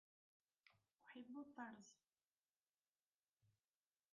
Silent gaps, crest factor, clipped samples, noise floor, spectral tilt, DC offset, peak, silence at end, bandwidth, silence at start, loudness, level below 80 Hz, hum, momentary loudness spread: 0.93-0.97 s, 2.32-2.36 s, 2.50-2.54 s, 2.81-2.93 s, 3.02-3.06 s, 3.15-3.20 s, 3.33-3.37 s; 22 dB; under 0.1%; under -90 dBFS; -3.5 dB/octave; under 0.1%; -42 dBFS; 0.6 s; 7 kHz; 0.65 s; -59 LUFS; under -90 dBFS; none; 9 LU